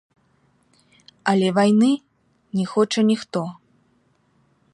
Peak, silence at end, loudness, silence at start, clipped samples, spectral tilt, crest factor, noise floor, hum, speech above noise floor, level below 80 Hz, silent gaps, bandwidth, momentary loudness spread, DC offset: -4 dBFS; 1.2 s; -20 LUFS; 1.25 s; under 0.1%; -6 dB/octave; 18 dB; -63 dBFS; none; 44 dB; -68 dBFS; none; 11 kHz; 12 LU; under 0.1%